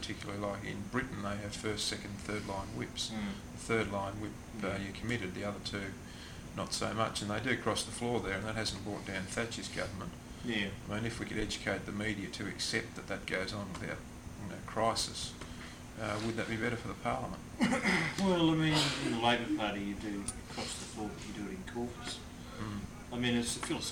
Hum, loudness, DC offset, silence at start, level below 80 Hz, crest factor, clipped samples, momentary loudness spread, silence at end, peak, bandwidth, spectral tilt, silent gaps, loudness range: none; -36 LUFS; under 0.1%; 0 s; -54 dBFS; 20 dB; under 0.1%; 12 LU; 0 s; -16 dBFS; 18 kHz; -4 dB/octave; none; 7 LU